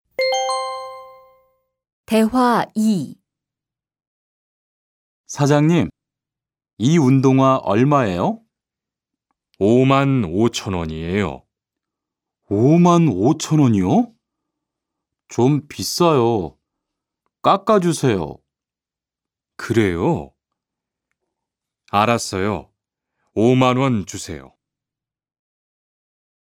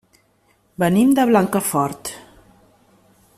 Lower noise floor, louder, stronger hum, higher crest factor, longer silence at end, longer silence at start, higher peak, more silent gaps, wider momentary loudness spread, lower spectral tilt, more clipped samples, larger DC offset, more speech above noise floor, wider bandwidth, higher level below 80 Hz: first, -89 dBFS vs -61 dBFS; about the same, -18 LUFS vs -17 LUFS; neither; about the same, 20 dB vs 18 dB; first, 2.2 s vs 1.15 s; second, 0.2 s vs 0.8 s; first, 0 dBFS vs -4 dBFS; first, 1.92-2.04 s, 4.07-5.24 s, 6.73-6.77 s vs none; second, 14 LU vs 17 LU; about the same, -6.5 dB/octave vs -5.5 dB/octave; neither; neither; first, 73 dB vs 44 dB; about the same, 16.5 kHz vs 15 kHz; first, -50 dBFS vs -58 dBFS